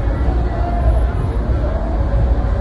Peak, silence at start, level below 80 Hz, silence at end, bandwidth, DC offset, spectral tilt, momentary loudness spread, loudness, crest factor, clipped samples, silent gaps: -4 dBFS; 0 s; -16 dBFS; 0 s; 4.9 kHz; under 0.1%; -9 dB/octave; 3 LU; -19 LUFS; 12 dB; under 0.1%; none